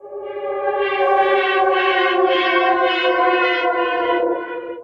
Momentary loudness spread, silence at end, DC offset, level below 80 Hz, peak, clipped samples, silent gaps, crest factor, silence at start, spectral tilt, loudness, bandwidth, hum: 9 LU; 0 s; under 0.1%; -60 dBFS; -4 dBFS; under 0.1%; none; 14 dB; 0.05 s; -4 dB/octave; -17 LUFS; 6.4 kHz; none